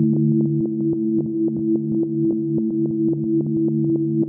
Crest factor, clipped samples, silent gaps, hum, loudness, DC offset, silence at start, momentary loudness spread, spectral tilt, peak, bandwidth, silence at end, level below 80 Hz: 12 dB; under 0.1%; none; none; -21 LUFS; under 0.1%; 0 s; 3 LU; -17.5 dB/octave; -8 dBFS; 1.1 kHz; 0 s; -58 dBFS